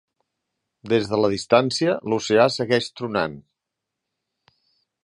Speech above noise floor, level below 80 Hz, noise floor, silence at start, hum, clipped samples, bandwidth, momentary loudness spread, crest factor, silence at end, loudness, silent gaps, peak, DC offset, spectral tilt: 63 dB; -60 dBFS; -83 dBFS; 0.85 s; none; under 0.1%; 11.5 kHz; 7 LU; 20 dB; 1.65 s; -21 LUFS; none; -2 dBFS; under 0.1%; -5 dB/octave